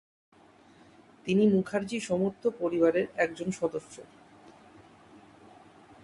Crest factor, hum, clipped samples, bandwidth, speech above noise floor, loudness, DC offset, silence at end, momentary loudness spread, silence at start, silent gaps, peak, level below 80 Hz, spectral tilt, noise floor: 20 dB; none; under 0.1%; 11.5 kHz; 30 dB; -29 LUFS; under 0.1%; 2 s; 15 LU; 1.25 s; none; -12 dBFS; -68 dBFS; -6.5 dB/octave; -58 dBFS